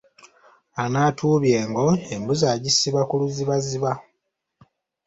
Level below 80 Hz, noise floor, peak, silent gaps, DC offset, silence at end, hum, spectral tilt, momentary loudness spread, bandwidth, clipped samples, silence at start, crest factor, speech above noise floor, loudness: -58 dBFS; -77 dBFS; -6 dBFS; none; under 0.1%; 1.05 s; none; -5 dB/octave; 8 LU; 8 kHz; under 0.1%; 0.25 s; 18 dB; 56 dB; -21 LUFS